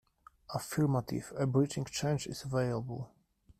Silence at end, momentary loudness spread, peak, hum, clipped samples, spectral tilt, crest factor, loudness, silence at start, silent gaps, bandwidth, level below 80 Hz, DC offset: 0.55 s; 11 LU; -16 dBFS; none; under 0.1%; -6 dB/octave; 18 dB; -34 LUFS; 0.5 s; none; 15 kHz; -62 dBFS; under 0.1%